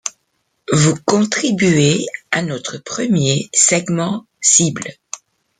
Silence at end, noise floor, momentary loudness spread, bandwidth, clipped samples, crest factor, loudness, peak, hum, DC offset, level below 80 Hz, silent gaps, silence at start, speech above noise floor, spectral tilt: 0.45 s; -68 dBFS; 16 LU; 9.6 kHz; under 0.1%; 16 dB; -15 LUFS; 0 dBFS; none; under 0.1%; -54 dBFS; none; 0.05 s; 52 dB; -3.5 dB/octave